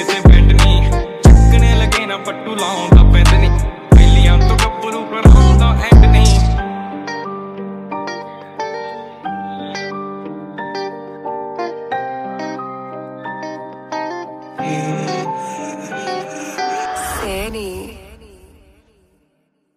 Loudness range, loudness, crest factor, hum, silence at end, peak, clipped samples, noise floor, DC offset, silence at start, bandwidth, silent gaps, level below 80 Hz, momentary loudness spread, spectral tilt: 15 LU; -14 LUFS; 12 dB; none; 1.8 s; 0 dBFS; under 0.1%; -64 dBFS; under 0.1%; 0 s; 13 kHz; none; -14 dBFS; 19 LU; -6 dB/octave